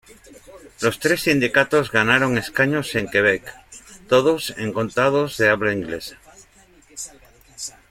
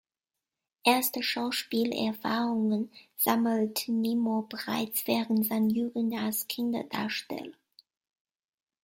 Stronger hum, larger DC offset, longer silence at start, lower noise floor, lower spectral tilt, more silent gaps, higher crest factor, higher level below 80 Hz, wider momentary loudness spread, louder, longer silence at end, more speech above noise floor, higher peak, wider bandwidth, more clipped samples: neither; neither; second, 0.35 s vs 0.85 s; second, -52 dBFS vs under -90 dBFS; about the same, -4.5 dB/octave vs -4 dB/octave; neither; about the same, 20 dB vs 20 dB; first, -52 dBFS vs -74 dBFS; first, 17 LU vs 7 LU; first, -19 LUFS vs -29 LUFS; second, 0.2 s vs 1.35 s; second, 33 dB vs over 61 dB; first, -2 dBFS vs -10 dBFS; about the same, 16.5 kHz vs 16.5 kHz; neither